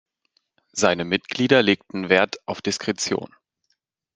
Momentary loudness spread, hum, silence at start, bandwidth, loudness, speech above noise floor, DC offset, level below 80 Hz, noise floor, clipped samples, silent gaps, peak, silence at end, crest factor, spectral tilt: 11 LU; none; 0.75 s; 10 kHz; -22 LUFS; 52 dB; under 0.1%; -64 dBFS; -73 dBFS; under 0.1%; none; 0 dBFS; 0.9 s; 22 dB; -3.5 dB/octave